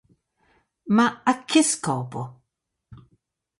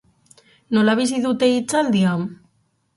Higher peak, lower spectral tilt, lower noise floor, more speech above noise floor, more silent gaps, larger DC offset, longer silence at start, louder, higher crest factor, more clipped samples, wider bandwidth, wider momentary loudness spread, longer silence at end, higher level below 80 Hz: about the same, -6 dBFS vs -4 dBFS; second, -4 dB/octave vs -5.5 dB/octave; first, -80 dBFS vs -65 dBFS; first, 58 dB vs 47 dB; neither; neither; first, 0.85 s vs 0.7 s; second, -22 LUFS vs -19 LUFS; about the same, 20 dB vs 16 dB; neither; about the same, 11.5 kHz vs 11.5 kHz; first, 16 LU vs 6 LU; about the same, 0.65 s vs 0.65 s; about the same, -66 dBFS vs -64 dBFS